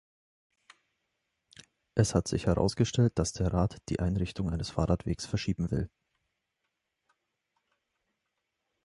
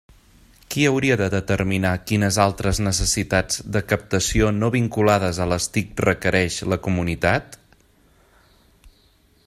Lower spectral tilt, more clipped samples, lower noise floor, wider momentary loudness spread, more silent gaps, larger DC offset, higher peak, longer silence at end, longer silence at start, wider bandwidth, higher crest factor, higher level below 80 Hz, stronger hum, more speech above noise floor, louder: first, -6 dB/octave vs -4.5 dB/octave; neither; first, -83 dBFS vs -58 dBFS; about the same, 6 LU vs 5 LU; neither; neither; second, -10 dBFS vs -2 dBFS; first, 3 s vs 0.55 s; first, 1.95 s vs 0.7 s; second, 11.5 kHz vs 15.5 kHz; about the same, 22 dB vs 20 dB; second, -44 dBFS vs -38 dBFS; neither; first, 54 dB vs 37 dB; second, -30 LUFS vs -21 LUFS